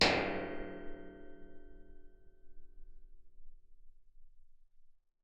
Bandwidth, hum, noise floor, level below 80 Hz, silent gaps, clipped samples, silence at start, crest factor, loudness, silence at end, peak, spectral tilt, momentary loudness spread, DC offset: 7.6 kHz; none; -59 dBFS; -54 dBFS; none; under 0.1%; 0 s; 28 dB; -38 LUFS; 0.3 s; -12 dBFS; -1.5 dB/octave; 27 LU; under 0.1%